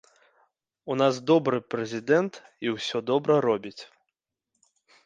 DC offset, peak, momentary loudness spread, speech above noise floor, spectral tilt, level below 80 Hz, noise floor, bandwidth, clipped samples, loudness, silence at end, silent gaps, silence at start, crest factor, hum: under 0.1%; -8 dBFS; 11 LU; 59 dB; -5.5 dB/octave; -72 dBFS; -84 dBFS; 9.2 kHz; under 0.1%; -26 LUFS; 1.2 s; none; 0.85 s; 20 dB; none